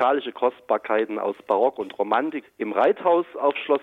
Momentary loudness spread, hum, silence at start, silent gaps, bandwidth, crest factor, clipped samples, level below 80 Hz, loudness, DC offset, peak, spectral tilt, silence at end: 7 LU; none; 0 s; none; 4.5 kHz; 14 dB; under 0.1%; -74 dBFS; -23 LUFS; under 0.1%; -8 dBFS; -6.5 dB/octave; 0 s